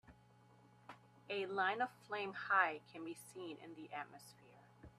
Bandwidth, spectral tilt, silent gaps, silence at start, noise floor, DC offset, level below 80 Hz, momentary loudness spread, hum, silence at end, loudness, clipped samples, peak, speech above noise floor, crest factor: 13.5 kHz; -4 dB/octave; none; 0.1 s; -67 dBFS; under 0.1%; -80 dBFS; 25 LU; none; 0.1 s; -41 LUFS; under 0.1%; -20 dBFS; 25 dB; 24 dB